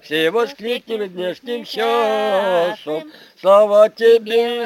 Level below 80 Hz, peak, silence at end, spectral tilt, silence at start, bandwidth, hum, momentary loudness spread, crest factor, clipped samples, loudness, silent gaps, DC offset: -72 dBFS; -2 dBFS; 0 s; -4 dB/octave; 0.05 s; 17 kHz; none; 14 LU; 16 dB; under 0.1%; -17 LUFS; none; under 0.1%